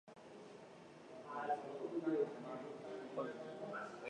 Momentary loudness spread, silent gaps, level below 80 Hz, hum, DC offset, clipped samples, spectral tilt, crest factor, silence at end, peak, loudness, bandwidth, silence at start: 17 LU; none; -88 dBFS; none; under 0.1%; under 0.1%; -6.5 dB/octave; 18 dB; 0 s; -28 dBFS; -45 LUFS; 10 kHz; 0.05 s